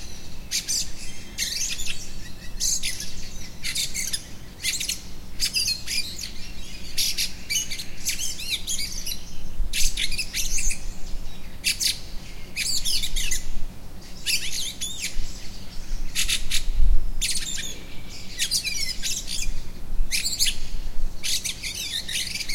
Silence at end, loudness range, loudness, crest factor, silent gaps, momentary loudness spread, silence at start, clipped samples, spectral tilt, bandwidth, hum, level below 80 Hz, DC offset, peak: 0 s; 2 LU; -26 LUFS; 18 dB; none; 16 LU; 0 s; under 0.1%; -0.5 dB/octave; 16.5 kHz; none; -30 dBFS; under 0.1%; -6 dBFS